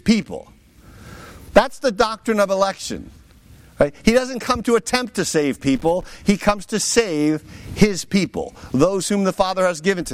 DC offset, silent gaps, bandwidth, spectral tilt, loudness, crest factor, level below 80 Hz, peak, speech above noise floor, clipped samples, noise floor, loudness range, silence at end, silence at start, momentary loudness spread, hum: under 0.1%; none; 16 kHz; -4.5 dB/octave; -19 LUFS; 18 dB; -40 dBFS; -2 dBFS; 27 dB; under 0.1%; -47 dBFS; 2 LU; 0 s; 0.05 s; 12 LU; none